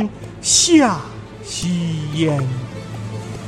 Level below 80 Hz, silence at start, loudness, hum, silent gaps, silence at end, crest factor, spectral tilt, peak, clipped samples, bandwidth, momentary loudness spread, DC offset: -46 dBFS; 0 s; -17 LUFS; none; none; 0 s; 18 dB; -3.5 dB/octave; -2 dBFS; under 0.1%; 14.5 kHz; 18 LU; under 0.1%